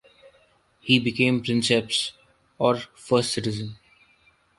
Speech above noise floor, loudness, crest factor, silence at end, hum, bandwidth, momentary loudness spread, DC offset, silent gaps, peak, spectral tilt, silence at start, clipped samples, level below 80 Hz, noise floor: 38 dB; -23 LUFS; 22 dB; 0.85 s; none; 11.5 kHz; 11 LU; under 0.1%; none; -4 dBFS; -4.5 dB/octave; 0.85 s; under 0.1%; -60 dBFS; -61 dBFS